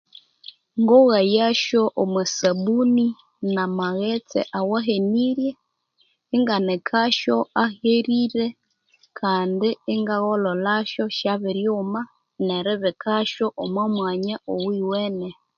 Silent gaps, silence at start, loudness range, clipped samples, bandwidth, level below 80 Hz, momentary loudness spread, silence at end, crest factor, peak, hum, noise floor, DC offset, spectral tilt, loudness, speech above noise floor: none; 0.75 s; 5 LU; under 0.1%; 7.2 kHz; -68 dBFS; 8 LU; 0.25 s; 18 dB; -4 dBFS; none; -66 dBFS; under 0.1%; -5 dB/octave; -22 LUFS; 45 dB